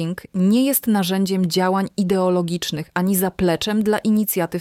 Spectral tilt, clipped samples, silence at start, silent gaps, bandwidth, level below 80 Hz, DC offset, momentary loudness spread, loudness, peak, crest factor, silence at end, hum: -5.5 dB/octave; under 0.1%; 0 s; none; 17 kHz; -50 dBFS; under 0.1%; 5 LU; -19 LUFS; -6 dBFS; 14 dB; 0 s; none